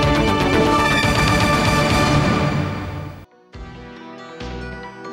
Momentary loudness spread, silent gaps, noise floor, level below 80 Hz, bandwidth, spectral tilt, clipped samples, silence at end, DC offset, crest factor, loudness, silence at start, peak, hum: 21 LU; none; -39 dBFS; -32 dBFS; 16 kHz; -5 dB/octave; under 0.1%; 0 s; under 0.1%; 12 dB; -17 LUFS; 0 s; -6 dBFS; none